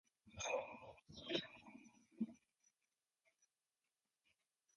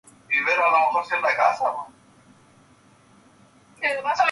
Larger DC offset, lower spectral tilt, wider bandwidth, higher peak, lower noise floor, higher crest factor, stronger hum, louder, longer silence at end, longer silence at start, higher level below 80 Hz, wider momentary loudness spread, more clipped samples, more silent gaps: neither; about the same, -3 dB/octave vs -2 dB/octave; about the same, 11 kHz vs 11.5 kHz; second, -28 dBFS vs -6 dBFS; first, under -90 dBFS vs -55 dBFS; first, 24 dB vs 18 dB; neither; second, -47 LUFS vs -21 LUFS; first, 2.4 s vs 0 s; about the same, 0.25 s vs 0.3 s; second, -78 dBFS vs -72 dBFS; first, 18 LU vs 9 LU; neither; neither